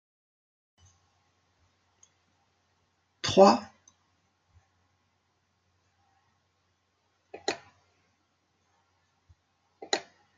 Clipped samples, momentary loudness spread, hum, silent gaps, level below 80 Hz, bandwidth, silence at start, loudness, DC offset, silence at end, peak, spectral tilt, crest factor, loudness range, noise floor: under 0.1%; 16 LU; none; none; -74 dBFS; 9 kHz; 3.25 s; -26 LUFS; under 0.1%; 0.35 s; -6 dBFS; -4.5 dB/octave; 28 dB; 15 LU; -74 dBFS